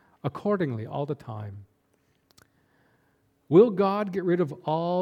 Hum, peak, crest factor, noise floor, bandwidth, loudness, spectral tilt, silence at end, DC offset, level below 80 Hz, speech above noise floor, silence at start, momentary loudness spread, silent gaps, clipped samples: none; -6 dBFS; 20 dB; -69 dBFS; 6.8 kHz; -25 LUFS; -9 dB/octave; 0 s; under 0.1%; -70 dBFS; 44 dB; 0.25 s; 16 LU; none; under 0.1%